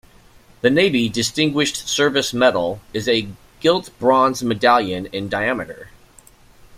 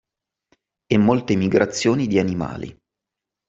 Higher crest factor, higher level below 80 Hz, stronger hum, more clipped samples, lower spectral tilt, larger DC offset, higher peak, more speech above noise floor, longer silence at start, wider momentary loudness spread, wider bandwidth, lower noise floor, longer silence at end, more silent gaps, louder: about the same, 18 dB vs 18 dB; about the same, -52 dBFS vs -54 dBFS; neither; neither; second, -4 dB/octave vs -6 dB/octave; neither; about the same, -2 dBFS vs -2 dBFS; second, 30 dB vs 66 dB; second, 0.65 s vs 0.9 s; second, 9 LU vs 12 LU; first, 16 kHz vs 8 kHz; second, -49 dBFS vs -85 dBFS; second, 0 s vs 0.75 s; neither; about the same, -18 LUFS vs -20 LUFS